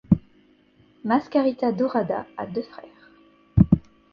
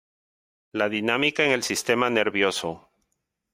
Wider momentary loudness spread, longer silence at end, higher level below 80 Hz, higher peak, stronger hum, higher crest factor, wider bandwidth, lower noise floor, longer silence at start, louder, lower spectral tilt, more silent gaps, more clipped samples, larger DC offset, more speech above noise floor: about the same, 13 LU vs 12 LU; second, 0.3 s vs 0.75 s; first, -40 dBFS vs -66 dBFS; first, -2 dBFS vs -6 dBFS; neither; about the same, 22 dB vs 20 dB; second, 6 kHz vs 16 kHz; second, -58 dBFS vs -78 dBFS; second, 0.1 s vs 0.75 s; about the same, -24 LUFS vs -23 LUFS; first, -10.5 dB/octave vs -3 dB/octave; neither; neither; neither; second, 34 dB vs 54 dB